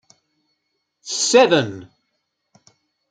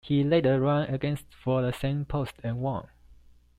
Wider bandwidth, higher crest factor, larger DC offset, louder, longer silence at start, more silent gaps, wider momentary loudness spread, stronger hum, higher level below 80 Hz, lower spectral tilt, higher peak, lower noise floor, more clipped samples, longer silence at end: second, 9.6 kHz vs 14.5 kHz; about the same, 20 dB vs 16 dB; neither; first, -17 LUFS vs -28 LUFS; first, 1.05 s vs 0.05 s; neither; first, 25 LU vs 10 LU; neither; second, -68 dBFS vs -50 dBFS; second, -3 dB/octave vs -8 dB/octave; first, -2 dBFS vs -12 dBFS; first, -74 dBFS vs -55 dBFS; neither; first, 1.25 s vs 0.45 s